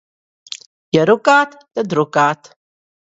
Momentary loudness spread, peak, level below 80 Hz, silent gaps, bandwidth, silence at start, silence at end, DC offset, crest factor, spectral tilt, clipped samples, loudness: 20 LU; 0 dBFS; -60 dBFS; 0.66-0.92 s; 8 kHz; 0.5 s; 0.7 s; under 0.1%; 18 dB; -5 dB/octave; under 0.1%; -15 LUFS